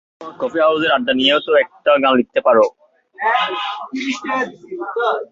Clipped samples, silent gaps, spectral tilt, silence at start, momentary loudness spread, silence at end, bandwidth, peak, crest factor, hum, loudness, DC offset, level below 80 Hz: under 0.1%; none; -4 dB/octave; 0.2 s; 11 LU; 0.05 s; 7.6 kHz; 0 dBFS; 16 dB; none; -17 LUFS; under 0.1%; -62 dBFS